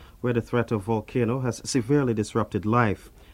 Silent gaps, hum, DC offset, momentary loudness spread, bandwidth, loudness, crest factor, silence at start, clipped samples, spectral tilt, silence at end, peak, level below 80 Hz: none; none; under 0.1%; 5 LU; 15.5 kHz; -25 LUFS; 20 dB; 0 s; under 0.1%; -6.5 dB/octave; 0.25 s; -6 dBFS; -50 dBFS